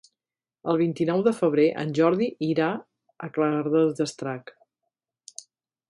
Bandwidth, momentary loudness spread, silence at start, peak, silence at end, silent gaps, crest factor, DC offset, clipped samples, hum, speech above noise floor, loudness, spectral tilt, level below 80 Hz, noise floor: 11.5 kHz; 17 LU; 0.65 s; -8 dBFS; 1.5 s; none; 18 dB; under 0.1%; under 0.1%; none; over 66 dB; -24 LUFS; -6.5 dB/octave; -72 dBFS; under -90 dBFS